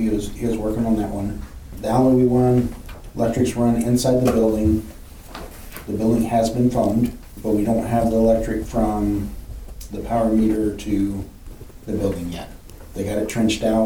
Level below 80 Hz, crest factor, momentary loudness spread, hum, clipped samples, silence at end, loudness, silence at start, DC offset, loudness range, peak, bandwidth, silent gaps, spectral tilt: -34 dBFS; 14 dB; 19 LU; none; under 0.1%; 0 s; -20 LUFS; 0 s; 0.2%; 5 LU; -6 dBFS; 18 kHz; none; -7 dB/octave